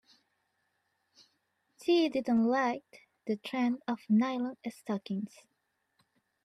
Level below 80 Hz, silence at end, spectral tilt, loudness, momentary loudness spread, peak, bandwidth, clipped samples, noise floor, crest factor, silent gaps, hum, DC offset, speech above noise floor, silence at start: -80 dBFS; 1.2 s; -6 dB/octave; -32 LUFS; 12 LU; -18 dBFS; 12.5 kHz; under 0.1%; -79 dBFS; 16 dB; none; none; under 0.1%; 48 dB; 1.8 s